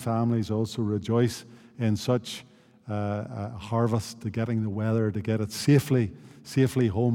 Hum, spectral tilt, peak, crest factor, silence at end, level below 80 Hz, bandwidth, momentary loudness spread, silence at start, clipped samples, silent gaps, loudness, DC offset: none; -7 dB/octave; -8 dBFS; 18 dB; 0 s; -62 dBFS; 16.5 kHz; 12 LU; 0 s; under 0.1%; none; -27 LUFS; under 0.1%